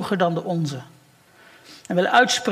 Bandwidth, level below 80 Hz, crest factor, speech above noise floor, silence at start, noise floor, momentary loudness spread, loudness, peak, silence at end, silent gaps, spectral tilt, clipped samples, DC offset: 15.5 kHz; -68 dBFS; 20 dB; 33 dB; 0 s; -53 dBFS; 12 LU; -21 LUFS; -2 dBFS; 0 s; none; -4 dB/octave; under 0.1%; under 0.1%